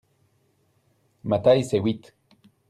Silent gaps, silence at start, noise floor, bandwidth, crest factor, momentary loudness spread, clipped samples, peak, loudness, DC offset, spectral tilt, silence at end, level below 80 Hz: none; 1.25 s; -67 dBFS; 13 kHz; 20 dB; 16 LU; under 0.1%; -6 dBFS; -23 LUFS; under 0.1%; -7 dB/octave; 0.7 s; -60 dBFS